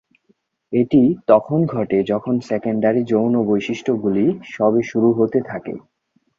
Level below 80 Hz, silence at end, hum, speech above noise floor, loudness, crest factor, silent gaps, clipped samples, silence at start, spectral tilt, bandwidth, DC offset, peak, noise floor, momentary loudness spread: -58 dBFS; 0.6 s; none; 45 dB; -18 LUFS; 18 dB; none; under 0.1%; 0.7 s; -8 dB/octave; 7.4 kHz; under 0.1%; -2 dBFS; -63 dBFS; 7 LU